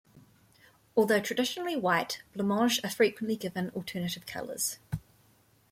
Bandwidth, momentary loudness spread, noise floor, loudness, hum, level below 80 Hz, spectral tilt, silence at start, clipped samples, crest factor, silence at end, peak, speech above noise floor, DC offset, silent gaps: 16.5 kHz; 11 LU; -65 dBFS; -30 LUFS; none; -62 dBFS; -4 dB/octave; 0.15 s; under 0.1%; 20 dB; 0.7 s; -12 dBFS; 35 dB; under 0.1%; none